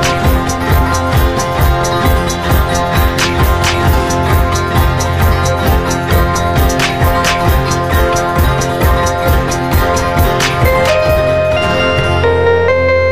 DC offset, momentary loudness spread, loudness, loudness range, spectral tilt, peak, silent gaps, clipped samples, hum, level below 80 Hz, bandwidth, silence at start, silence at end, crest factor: under 0.1%; 2 LU; -12 LUFS; 1 LU; -5 dB/octave; 0 dBFS; none; under 0.1%; none; -18 dBFS; 15.5 kHz; 0 s; 0 s; 10 dB